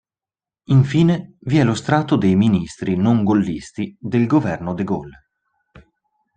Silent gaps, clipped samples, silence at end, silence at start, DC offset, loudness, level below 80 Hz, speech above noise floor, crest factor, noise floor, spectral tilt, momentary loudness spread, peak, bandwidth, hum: none; under 0.1%; 1.25 s; 0.7 s; under 0.1%; -18 LUFS; -52 dBFS; over 73 dB; 16 dB; under -90 dBFS; -7.5 dB/octave; 9 LU; -2 dBFS; 9.4 kHz; none